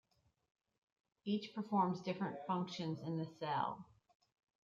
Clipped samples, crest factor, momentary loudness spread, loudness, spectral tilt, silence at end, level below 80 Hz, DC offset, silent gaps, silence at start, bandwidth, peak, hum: under 0.1%; 20 dB; 7 LU; -41 LUFS; -7 dB/octave; 0.8 s; -84 dBFS; under 0.1%; none; 1.25 s; 7.4 kHz; -22 dBFS; none